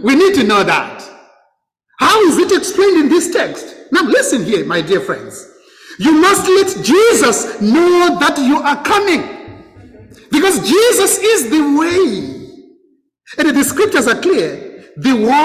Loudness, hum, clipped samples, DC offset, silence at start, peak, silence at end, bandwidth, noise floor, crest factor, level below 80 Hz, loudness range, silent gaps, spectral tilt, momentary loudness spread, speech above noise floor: -12 LUFS; none; under 0.1%; under 0.1%; 0 s; -2 dBFS; 0 s; 16 kHz; -62 dBFS; 12 dB; -50 dBFS; 4 LU; none; -3 dB/octave; 14 LU; 50 dB